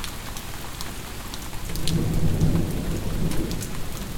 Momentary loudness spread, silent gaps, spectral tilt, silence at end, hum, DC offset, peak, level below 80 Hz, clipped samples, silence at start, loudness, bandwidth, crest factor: 11 LU; none; -5.5 dB/octave; 0 s; none; under 0.1%; -6 dBFS; -32 dBFS; under 0.1%; 0 s; -28 LUFS; 18.5 kHz; 20 dB